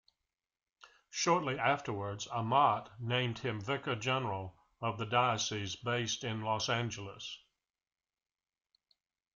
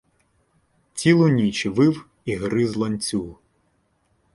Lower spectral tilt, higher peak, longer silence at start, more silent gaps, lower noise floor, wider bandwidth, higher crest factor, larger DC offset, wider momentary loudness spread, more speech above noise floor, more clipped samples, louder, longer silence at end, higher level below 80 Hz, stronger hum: second, -4 dB/octave vs -6 dB/octave; second, -14 dBFS vs -2 dBFS; about the same, 0.85 s vs 0.95 s; neither; first, -90 dBFS vs -67 dBFS; second, 7.6 kHz vs 11.5 kHz; about the same, 22 dB vs 20 dB; neither; about the same, 12 LU vs 13 LU; first, 56 dB vs 47 dB; neither; second, -34 LUFS vs -21 LUFS; first, 2 s vs 1 s; second, -70 dBFS vs -54 dBFS; neither